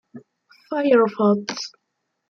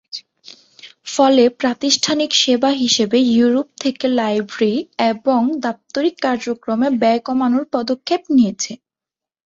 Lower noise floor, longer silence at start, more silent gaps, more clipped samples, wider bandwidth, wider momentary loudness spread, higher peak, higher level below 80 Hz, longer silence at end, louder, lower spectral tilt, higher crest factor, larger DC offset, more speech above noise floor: second, -57 dBFS vs -88 dBFS; about the same, 0.15 s vs 0.15 s; neither; neither; about the same, 7.2 kHz vs 7.8 kHz; first, 14 LU vs 9 LU; second, -4 dBFS vs 0 dBFS; second, -72 dBFS vs -62 dBFS; about the same, 0.6 s vs 0.7 s; second, -20 LUFS vs -17 LUFS; first, -5.5 dB/octave vs -3.5 dB/octave; about the same, 18 dB vs 16 dB; neither; second, 37 dB vs 71 dB